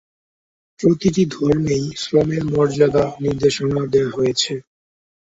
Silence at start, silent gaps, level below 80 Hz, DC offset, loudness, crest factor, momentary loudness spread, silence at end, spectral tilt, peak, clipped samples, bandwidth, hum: 0.8 s; none; -46 dBFS; under 0.1%; -18 LUFS; 16 dB; 5 LU; 0.6 s; -6 dB/octave; -2 dBFS; under 0.1%; 8 kHz; none